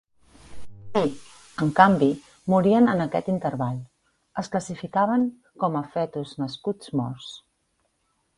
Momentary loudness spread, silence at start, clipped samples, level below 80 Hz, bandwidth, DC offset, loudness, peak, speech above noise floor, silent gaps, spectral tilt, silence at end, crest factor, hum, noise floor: 17 LU; 0.5 s; under 0.1%; -58 dBFS; 11.5 kHz; under 0.1%; -24 LUFS; 0 dBFS; 49 dB; none; -7 dB/octave; 1 s; 24 dB; none; -71 dBFS